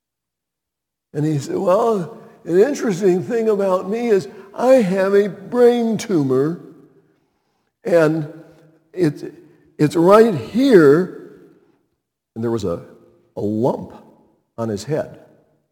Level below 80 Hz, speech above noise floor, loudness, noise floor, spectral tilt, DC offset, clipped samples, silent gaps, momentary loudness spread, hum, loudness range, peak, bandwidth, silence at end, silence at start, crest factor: -62 dBFS; 67 dB; -17 LUFS; -83 dBFS; -7 dB/octave; under 0.1%; under 0.1%; none; 20 LU; none; 9 LU; 0 dBFS; 17.5 kHz; 0.55 s; 1.15 s; 18 dB